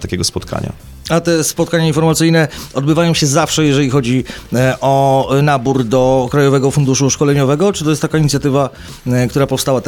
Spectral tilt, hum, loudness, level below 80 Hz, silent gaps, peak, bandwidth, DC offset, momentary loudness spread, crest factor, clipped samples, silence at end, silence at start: -5 dB/octave; none; -13 LUFS; -38 dBFS; none; -2 dBFS; 18 kHz; under 0.1%; 6 LU; 12 dB; under 0.1%; 0 s; 0 s